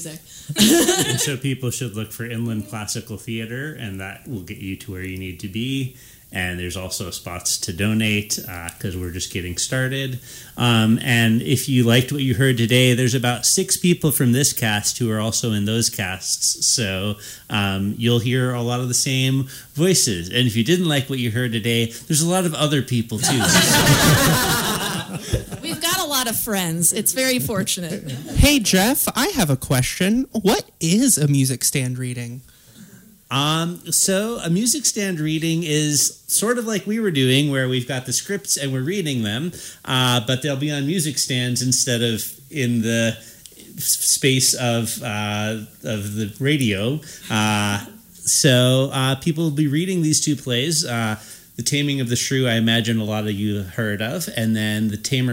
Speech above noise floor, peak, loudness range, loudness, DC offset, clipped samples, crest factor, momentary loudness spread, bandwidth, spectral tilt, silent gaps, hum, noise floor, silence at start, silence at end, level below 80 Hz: 26 dB; -2 dBFS; 7 LU; -19 LUFS; under 0.1%; under 0.1%; 18 dB; 13 LU; 16.5 kHz; -3.5 dB/octave; none; none; -46 dBFS; 0 s; 0 s; -42 dBFS